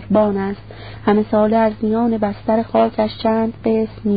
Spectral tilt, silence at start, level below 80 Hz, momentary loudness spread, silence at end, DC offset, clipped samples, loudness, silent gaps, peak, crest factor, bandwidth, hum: -12.5 dB/octave; 0 s; -44 dBFS; 7 LU; 0 s; 0.5%; under 0.1%; -18 LUFS; none; -2 dBFS; 16 dB; 5 kHz; none